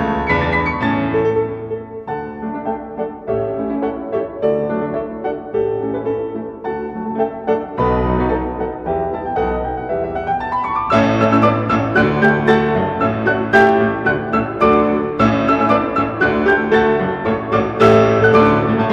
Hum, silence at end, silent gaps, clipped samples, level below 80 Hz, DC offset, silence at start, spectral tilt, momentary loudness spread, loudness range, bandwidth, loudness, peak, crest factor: none; 0 s; none; under 0.1%; -36 dBFS; under 0.1%; 0 s; -7.5 dB/octave; 12 LU; 7 LU; 7.8 kHz; -17 LUFS; 0 dBFS; 16 dB